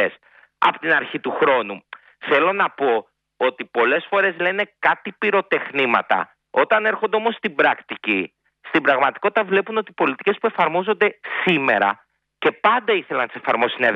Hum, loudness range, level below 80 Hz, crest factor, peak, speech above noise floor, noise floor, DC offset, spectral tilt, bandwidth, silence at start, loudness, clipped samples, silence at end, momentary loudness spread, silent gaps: none; 1 LU; -70 dBFS; 18 dB; -2 dBFS; 31 dB; -51 dBFS; under 0.1%; -6.5 dB/octave; 6.2 kHz; 0 s; -20 LUFS; under 0.1%; 0 s; 6 LU; none